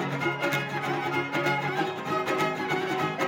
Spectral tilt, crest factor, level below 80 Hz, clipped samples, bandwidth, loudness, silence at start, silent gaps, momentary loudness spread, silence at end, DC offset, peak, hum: -5 dB/octave; 16 dB; -72 dBFS; under 0.1%; 17 kHz; -28 LUFS; 0 s; none; 3 LU; 0 s; under 0.1%; -12 dBFS; none